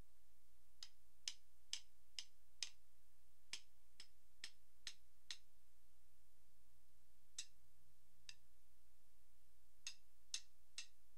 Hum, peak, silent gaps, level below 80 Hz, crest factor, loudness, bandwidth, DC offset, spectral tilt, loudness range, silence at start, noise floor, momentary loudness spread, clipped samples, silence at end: none; -26 dBFS; none; -82 dBFS; 36 dB; -56 LUFS; 15.5 kHz; 0.3%; 1 dB/octave; 8 LU; 0.8 s; -79 dBFS; 13 LU; under 0.1%; 0.3 s